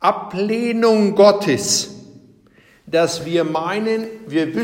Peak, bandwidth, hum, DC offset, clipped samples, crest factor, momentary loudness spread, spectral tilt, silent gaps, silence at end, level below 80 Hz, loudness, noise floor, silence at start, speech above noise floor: -2 dBFS; 16.5 kHz; none; under 0.1%; under 0.1%; 16 dB; 10 LU; -4 dB/octave; none; 0 s; -60 dBFS; -17 LUFS; -52 dBFS; 0 s; 35 dB